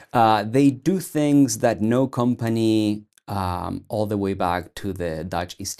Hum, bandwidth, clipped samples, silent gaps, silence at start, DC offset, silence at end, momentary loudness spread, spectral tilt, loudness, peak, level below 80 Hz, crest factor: none; 14.5 kHz; under 0.1%; none; 0.15 s; under 0.1%; 0.05 s; 10 LU; -6 dB/octave; -22 LUFS; -4 dBFS; -52 dBFS; 18 dB